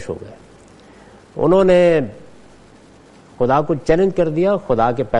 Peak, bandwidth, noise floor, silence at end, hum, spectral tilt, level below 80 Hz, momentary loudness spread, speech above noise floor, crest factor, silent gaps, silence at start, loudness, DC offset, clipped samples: 0 dBFS; 9.2 kHz; -45 dBFS; 0 s; none; -7.5 dB/octave; -40 dBFS; 18 LU; 30 dB; 16 dB; none; 0 s; -16 LUFS; under 0.1%; under 0.1%